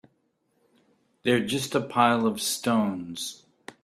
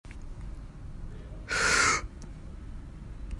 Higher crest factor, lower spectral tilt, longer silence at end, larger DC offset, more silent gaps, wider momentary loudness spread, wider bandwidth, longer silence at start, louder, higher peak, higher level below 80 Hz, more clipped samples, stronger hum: about the same, 22 dB vs 20 dB; first, -4 dB/octave vs -1.5 dB/octave; first, 0.5 s vs 0 s; neither; neither; second, 12 LU vs 22 LU; first, 15.5 kHz vs 11.5 kHz; first, 1.25 s vs 0.05 s; about the same, -26 LUFS vs -25 LUFS; first, -6 dBFS vs -12 dBFS; second, -68 dBFS vs -42 dBFS; neither; neither